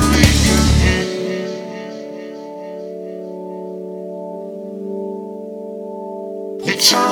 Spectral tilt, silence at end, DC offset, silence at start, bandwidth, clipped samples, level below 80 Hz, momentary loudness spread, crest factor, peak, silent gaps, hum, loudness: -4 dB/octave; 0 s; under 0.1%; 0 s; 19 kHz; under 0.1%; -26 dBFS; 18 LU; 18 dB; 0 dBFS; none; none; -19 LUFS